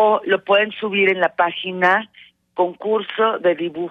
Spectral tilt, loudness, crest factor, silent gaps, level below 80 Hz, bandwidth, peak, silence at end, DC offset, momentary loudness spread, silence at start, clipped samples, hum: -6.5 dB/octave; -18 LUFS; 14 dB; none; -72 dBFS; 6.8 kHz; -4 dBFS; 0 s; under 0.1%; 6 LU; 0 s; under 0.1%; none